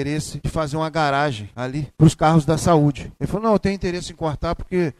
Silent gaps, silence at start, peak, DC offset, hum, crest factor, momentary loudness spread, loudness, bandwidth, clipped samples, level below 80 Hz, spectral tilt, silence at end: none; 0 s; -2 dBFS; under 0.1%; none; 18 dB; 10 LU; -20 LUFS; 13 kHz; under 0.1%; -38 dBFS; -6.5 dB/octave; 0.05 s